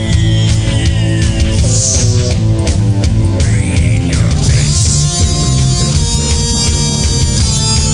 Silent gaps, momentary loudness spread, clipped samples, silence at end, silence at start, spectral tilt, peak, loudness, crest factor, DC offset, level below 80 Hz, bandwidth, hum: none; 2 LU; under 0.1%; 0 s; 0 s; -4.5 dB/octave; 0 dBFS; -11 LUFS; 10 dB; under 0.1%; -18 dBFS; 11 kHz; none